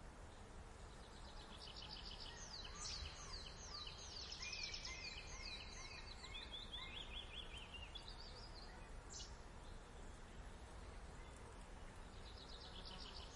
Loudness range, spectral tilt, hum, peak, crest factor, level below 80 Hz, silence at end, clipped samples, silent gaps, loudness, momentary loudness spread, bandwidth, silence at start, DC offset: 8 LU; -2.5 dB/octave; none; -36 dBFS; 18 dB; -58 dBFS; 0 s; under 0.1%; none; -53 LUFS; 10 LU; 11.5 kHz; 0 s; under 0.1%